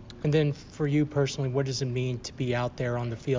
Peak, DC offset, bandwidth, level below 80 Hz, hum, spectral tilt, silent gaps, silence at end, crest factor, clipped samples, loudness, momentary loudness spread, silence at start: -12 dBFS; under 0.1%; 7.6 kHz; -52 dBFS; none; -6.5 dB/octave; none; 0 s; 16 dB; under 0.1%; -29 LUFS; 6 LU; 0 s